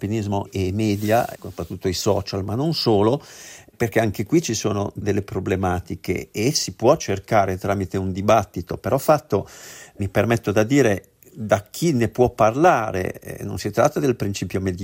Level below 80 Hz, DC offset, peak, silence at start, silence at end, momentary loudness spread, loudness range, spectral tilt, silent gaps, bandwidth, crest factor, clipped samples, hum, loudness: -50 dBFS; under 0.1%; -4 dBFS; 0 s; 0 s; 11 LU; 2 LU; -5.5 dB/octave; none; 16.5 kHz; 18 dB; under 0.1%; none; -21 LUFS